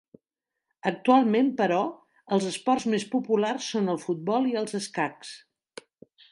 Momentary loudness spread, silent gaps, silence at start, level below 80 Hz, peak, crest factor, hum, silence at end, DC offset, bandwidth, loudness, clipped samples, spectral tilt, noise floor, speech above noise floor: 11 LU; none; 0.85 s; -76 dBFS; -8 dBFS; 18 dB; none; 0.95 s; under 0.1%; 11.5 kHz; -26 LUFS; under 0.1%; -5 dB/octave; -87 dBFS; 61 dB